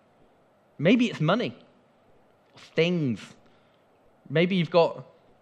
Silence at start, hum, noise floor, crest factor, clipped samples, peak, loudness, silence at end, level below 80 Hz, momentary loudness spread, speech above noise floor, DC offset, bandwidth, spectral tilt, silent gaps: 0.8 s; none; -62 dBFS; 20 dB; under 0.1%; -8 dBFS; -25 LUFS; 0.4 s; -76 dBFS; 11 LU; 37 dB; under 0.1%; 9 kHz; -7 dB/octave; none